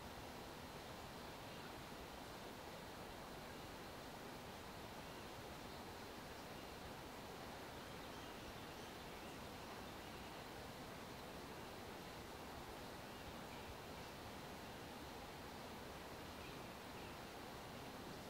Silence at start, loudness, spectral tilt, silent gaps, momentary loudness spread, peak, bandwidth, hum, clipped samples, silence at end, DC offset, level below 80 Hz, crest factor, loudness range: 0 s; -53 LUFS; -4 dB/octave; none; 1 LU; -40 dBFS; 16 kHz; none; under 0.1%; 0 s; under 0.1%; -66 dBFS; 14 dB; 0 LU